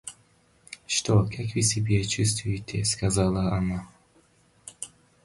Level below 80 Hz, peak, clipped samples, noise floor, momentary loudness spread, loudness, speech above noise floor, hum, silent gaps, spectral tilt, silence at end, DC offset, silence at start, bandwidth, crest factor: -44 dBFS; -10 dBFS; under 0.1%; -62 dBFS; 19 LU; -26 LUFS; 37 dB; none; none; -4.5 dB/octave; 0.35 s; under 0.1%; 0.05 s; 11.5 kHz; 18 dB